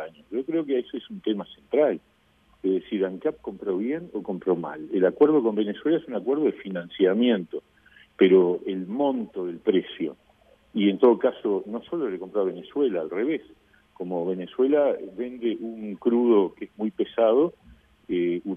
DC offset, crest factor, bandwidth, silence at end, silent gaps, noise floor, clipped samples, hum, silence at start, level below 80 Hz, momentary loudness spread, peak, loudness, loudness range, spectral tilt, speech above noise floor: under 0.1%; 18 dB; 3.7 kHz; 0 s; none; -62 dBFS; under 0.1%; none; 0 s; -66 dBFS; 13 LU; -6 dBFS; -25 LUFS; 4 LU; -9 dB/octave; 37 dB